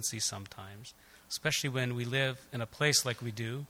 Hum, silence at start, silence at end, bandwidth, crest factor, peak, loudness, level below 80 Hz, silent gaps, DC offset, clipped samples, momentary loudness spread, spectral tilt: none; 0 s; 0.05 s; 17 kHz; 22 dB; -14 dBFS; -32 LUFS; -66 dBFS; none; under 0.1%; under 0.1%; 20 LU; -3 dB/octave